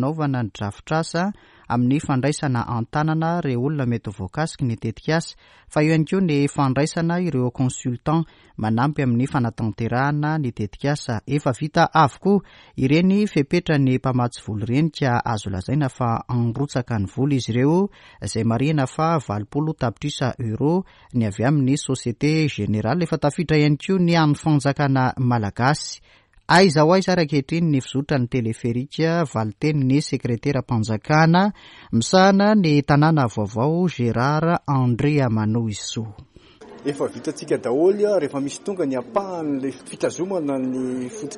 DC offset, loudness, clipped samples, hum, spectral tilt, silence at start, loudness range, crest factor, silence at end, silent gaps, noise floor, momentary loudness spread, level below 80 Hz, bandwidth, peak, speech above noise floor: under 0.1%; -21 LUFS; under 0.1%; none; -6.5 dB/octave; 0 s; 5 LU; 18 dB; 0 s; none; -44 dBFS; 9 LU; -50 dBFS; 11.5 kHz; -4 dBFS; 24 dB